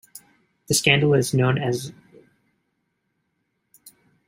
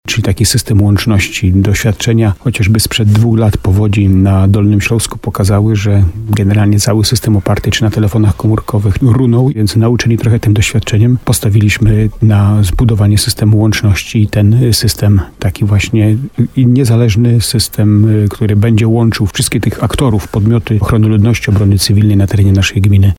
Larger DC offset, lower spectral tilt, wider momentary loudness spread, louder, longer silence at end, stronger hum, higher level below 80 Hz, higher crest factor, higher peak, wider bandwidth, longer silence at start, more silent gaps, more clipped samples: neither; second, -4.5 dB/octave vs -6 dB/octave; first, 12 LU vs 4 LU; second, -20 LUFS vs -10 LUFS; first, 2.35 s vs 0.05 s; neither; second, -60 dBFS vs -28 dBFS; first, 24 dB vs 8 dB; about the same, -2 dBFS vs 0 dBFS; about the same, 16 kHz vs 16 kHz; about the same, 0.15 s vs 0.05 s; neither; neither